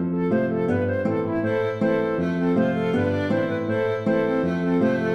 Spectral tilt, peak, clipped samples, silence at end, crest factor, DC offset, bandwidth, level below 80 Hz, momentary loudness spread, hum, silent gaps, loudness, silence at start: -8.5 dB/octave; -10 dBFS; under 0.1%; 0 s; 14 dB; under 0.1%; 8.4 kHz; -54 dBFS; 3 LU; none; none; -23 LUFS; 0 s